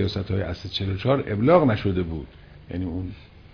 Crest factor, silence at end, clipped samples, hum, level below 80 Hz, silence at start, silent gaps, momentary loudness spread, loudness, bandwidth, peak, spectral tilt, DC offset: 20 dB; 0.15 s; under 0.1%; none; -44 dBFS; 0 s; none; 17 LU; -24 LUFS; 5.4 kHz; -4 dBFS; -8.5 dB/octave; under 0.1%